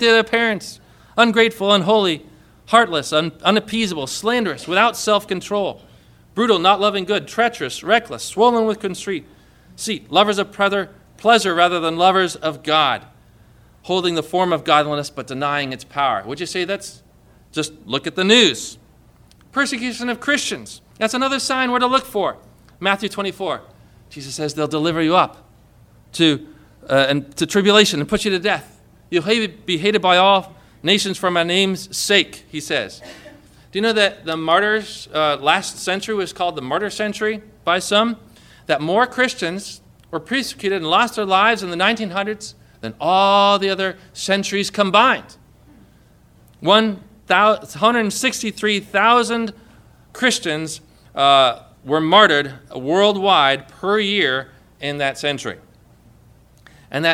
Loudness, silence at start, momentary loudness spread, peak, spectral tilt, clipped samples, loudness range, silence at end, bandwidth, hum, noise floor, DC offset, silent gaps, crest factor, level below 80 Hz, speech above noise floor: -18 LUFS; 0 s; 13 LU; 0 dBFS; -3.5 dB/octave; under 0.1%; 4 LU; 0 s; 16 kHz; none; -51 dBFS; under 0.1%; none; 20 dB; -54 dBFS; 33 dB